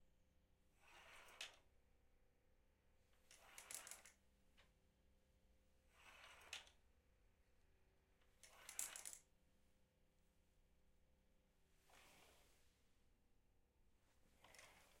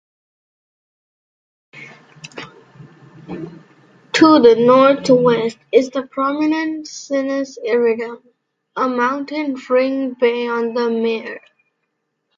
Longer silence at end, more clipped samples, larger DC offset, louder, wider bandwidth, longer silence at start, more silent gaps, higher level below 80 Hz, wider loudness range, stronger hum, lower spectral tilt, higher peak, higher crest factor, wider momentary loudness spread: second, 0 s vs 1 s; neither; neither; second, -57 LUFS vs -16 LUFS; first, 16 kHz vs 7.8 kHz; second, 0 s vs 1.75 s; neither; second, -80 dBFS vs -64 dBFS; about the same, 7 LU vs 7 LU; neither; second, 0 dB/octave vs -5 dB/octave; second, -28 dBFS vs 0 dBFS; first, 38 dB vs 18 dB; second, 18 LU vs 23 LU